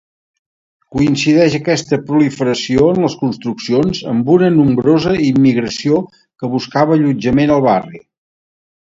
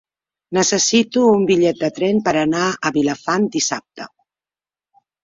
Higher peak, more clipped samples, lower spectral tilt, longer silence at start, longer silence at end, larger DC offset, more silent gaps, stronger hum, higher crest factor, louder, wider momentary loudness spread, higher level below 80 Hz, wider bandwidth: about the same, 0 dBFS vs -2 dBFS; neither; first, -6.5 dB/octave vs -3.5 dB/octave; first, 0.9 s vs 0.5 s; second, 1 s vs 1.15 s; neither; neither; neither; about the same, 14 dB vs 16 dB; first, -14 LUFS vs -17 LUFS; about the same, 8 LU vs 10 LU; first, -44 dBFS vs -58 dBFS; about the same, 7.8 kHz vs 7.8 kHz